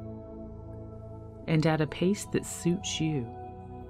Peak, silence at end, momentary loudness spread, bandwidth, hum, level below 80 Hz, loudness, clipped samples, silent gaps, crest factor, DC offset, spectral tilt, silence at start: -12 dBFS; 0 s; 17 LU; 15 kHz; none; -52 dBFS; -30 LUFS; under 0.1%; none; 18 dB; under 0.1%; -5.5 dB/octave; 0 s